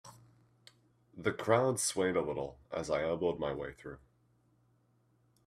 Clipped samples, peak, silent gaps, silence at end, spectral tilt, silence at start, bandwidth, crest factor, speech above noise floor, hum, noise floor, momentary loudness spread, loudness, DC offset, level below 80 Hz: under 0.1%; -14 dBFS; none; 1.5 s; -4.5 dB/octave; 0.05 s; 15 kHz; 24 dB; 38 dB; none; -72 dBFS; 15 LU; -34 LUFS; under 0.1%; -64 dBFS